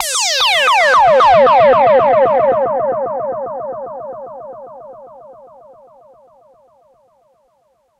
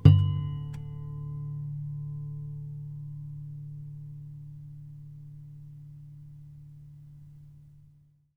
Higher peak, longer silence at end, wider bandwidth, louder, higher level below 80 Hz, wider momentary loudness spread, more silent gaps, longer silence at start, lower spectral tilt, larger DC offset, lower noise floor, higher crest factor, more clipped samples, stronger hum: about the same, -2 dBFS vs -2 dBFS; first, 2.65 s vs 0.55 s; first, 16 kHz vs 5.2 kHz; first, -11 LUFS vs -34 LUFS; about the same, -50 dBFS vs -50 dBFS; first, 22 LU vs 15 LU; neither; about the same, 0 s vs 0 s; second, -1.5 dB/octave vs -10 dB/octave; neither; about the same, -59 dBFS vs -60 dBFS; second, 12 dB vs 28 dB; neither; neither